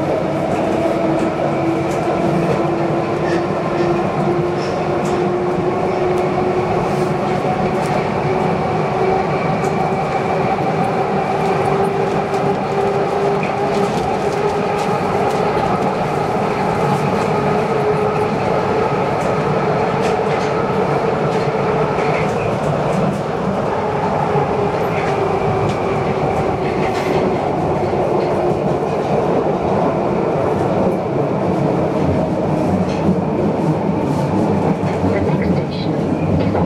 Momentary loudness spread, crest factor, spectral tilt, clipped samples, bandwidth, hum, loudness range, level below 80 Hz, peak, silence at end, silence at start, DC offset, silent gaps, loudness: 2 LU; 12 dB; -7.5 dB/octave; under 0.1%; 13.5 kHz; none; 1 LU; -42 dBFS; -4 dBFS; 0 s; 0 s; under 0.1%; none; -17 LUFS